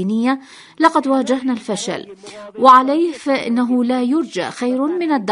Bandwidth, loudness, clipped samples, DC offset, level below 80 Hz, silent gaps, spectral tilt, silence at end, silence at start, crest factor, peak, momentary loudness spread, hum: 11 kHz; -16 LUFS; under 0.1%; under 0.1%; -66 dBFS; none; -5 dB/octave; 0 s; 0 s; 16 dB; 0 dBFS; 14 LU; none